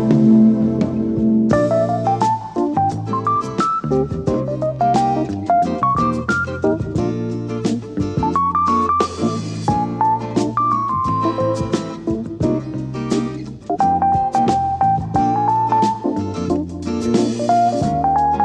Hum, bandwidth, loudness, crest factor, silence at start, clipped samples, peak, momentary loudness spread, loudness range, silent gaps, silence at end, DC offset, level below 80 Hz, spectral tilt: none; 9.8 kHz; -18 LUFS; 16 dB; 0 s; under 0.1%; -2 dBFS; 7 LU; 2 LU; none; 0 s; under 0.1%; -42 dBFS; -7.5 dB/octave